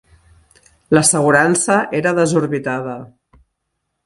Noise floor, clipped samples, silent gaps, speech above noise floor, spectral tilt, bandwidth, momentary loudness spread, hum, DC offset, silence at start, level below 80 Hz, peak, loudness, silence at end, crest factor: -74 dBFS; under 0.1%; none; 59 dB; -4 dB/octave; 11.5 kHz; 12 LU; none; under 0.1%; 0.9 s; -54 dBFS; 0 dBFS; -15 LUFS; 1 s; 18 dB